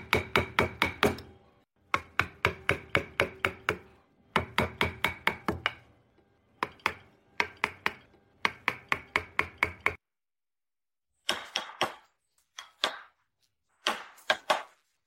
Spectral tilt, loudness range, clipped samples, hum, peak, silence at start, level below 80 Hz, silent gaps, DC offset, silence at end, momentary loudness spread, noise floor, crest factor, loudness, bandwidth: -3.5 dB/octave; 5 LU; under 0.1%; none; -8 dBFS; 0 s; -56 dBFS; none; under 0.1%; 0.4 s; 9 LU; under -90 dBFS; 26 dB; -31 LUFS; 16 kHz